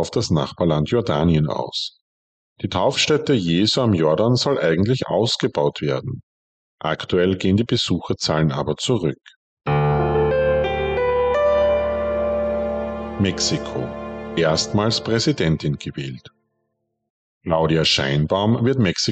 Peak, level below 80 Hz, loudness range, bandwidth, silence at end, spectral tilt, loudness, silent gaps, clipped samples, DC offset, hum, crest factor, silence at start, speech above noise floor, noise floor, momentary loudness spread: -8 dBFS; -40 dBFS; 3 LU; 9 kHz; 0 s; -5.5 dB/octave; -20 LUFS; 2.01-2.56 s, 6.23-6.78 s, 9.36-9.57 s, 17.10-17.41 s; under 0.1%; under 0.1%; none; 14 dB; 0 s; 54 dB; -74 dBFS; 10 LU